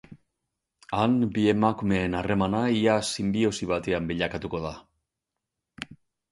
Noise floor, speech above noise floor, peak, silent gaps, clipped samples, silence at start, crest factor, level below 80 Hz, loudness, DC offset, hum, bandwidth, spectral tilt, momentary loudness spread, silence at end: -86 dBFS; 61 dB; -8 dBFS; none; under 0.1%; 0.1 s; 20 dB; -50 dBFS; -26 LUFS; under 0.1%; none; 11.5 kHz; -5.5 dB/octave; 16 LU; 0.35 s